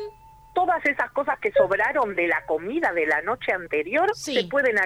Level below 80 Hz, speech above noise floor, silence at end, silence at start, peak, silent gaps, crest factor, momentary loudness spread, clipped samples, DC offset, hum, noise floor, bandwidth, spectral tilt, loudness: -56 dBFS; 22 dB; 0 s; 0 s; -6 dBFS; none; 16 dB; 5 LU; under 0.1%; under 0.1%; none; -45 dBFS; 15.5 kHz; -4 dB/octave; -23 LUFS